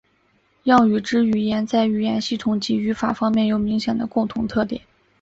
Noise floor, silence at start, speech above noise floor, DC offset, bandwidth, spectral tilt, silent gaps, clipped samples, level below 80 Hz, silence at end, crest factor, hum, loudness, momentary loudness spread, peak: -62 dBFS; 0.65 s; 43 dB; under 0.1%; 7.8 kHz; -6 dB/octave; none; under 0.1%; -52 dBFS; 0.4 s; 18 dB; none; -20 LUFS; 7 LU; -2 dBFS